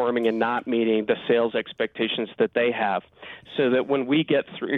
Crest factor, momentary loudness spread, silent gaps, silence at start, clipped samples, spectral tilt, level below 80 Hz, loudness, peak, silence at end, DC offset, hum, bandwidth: 14 dB; 7 LU; none; 0 s; under 0.1%; -8 dB/octave; -68 dBFS; -24 LUFS; -10 dBFS; 0 s; under 0.1%; none; 4.4 kHz